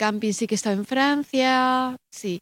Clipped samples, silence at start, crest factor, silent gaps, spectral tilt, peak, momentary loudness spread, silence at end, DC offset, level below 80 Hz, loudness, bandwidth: under 0.1%; 0 s; 18 dB; none; -4 dB/octave; -6 dBFS; 10 LU; 0 s; under 0.1%; -70 dBFS; -22 LUFS; 16.5 kHz